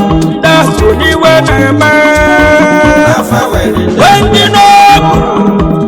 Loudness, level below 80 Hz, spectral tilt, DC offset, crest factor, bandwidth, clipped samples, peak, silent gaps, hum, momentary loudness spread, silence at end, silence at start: -6 LUFS; -22 dBFS; -5 dB/octave; under 0.1%; 6 dB; 20 kHz; 4%; 0 dBFS; none; none; 6 LU; 0 s; 0 s